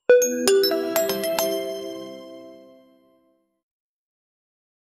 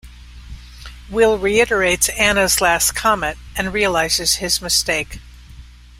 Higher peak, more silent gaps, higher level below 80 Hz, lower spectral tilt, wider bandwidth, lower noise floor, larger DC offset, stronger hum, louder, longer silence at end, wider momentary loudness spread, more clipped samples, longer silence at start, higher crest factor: about the same, -2 dBFS vs -2 dBFS; neither; second, -70 dBFS vs -36 dBFS; about the same, -2 dB/octave vs -2 dB/octave; about the same, 16 kHz vs 16 kHz; first, -65 dBFS vs -40 dBFS; neither; second, none vs 60 Hz at -35 dBFS; second, -21 LUFS vs -16 LUFS; first, 2.45 s vs 0.05 s; first, 22 LU vs 9 LU; neither; about the same, 0.1 s vs 0.05 s; first, 24 dB vs 18 dB